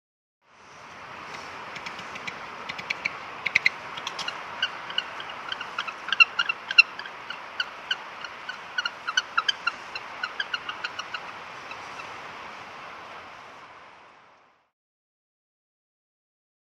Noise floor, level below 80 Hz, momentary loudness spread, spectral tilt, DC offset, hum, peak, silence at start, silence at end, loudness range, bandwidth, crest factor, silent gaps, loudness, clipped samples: -58 dBFS; -70 dBFS; 21 LU; -0.5 dB/octave; under 0.1%; none; -2 dBFS; 0.55 s; 2.4 s; 18 LU; 14 kHz; 30 dB; none; -27 LUFS; under 0.1%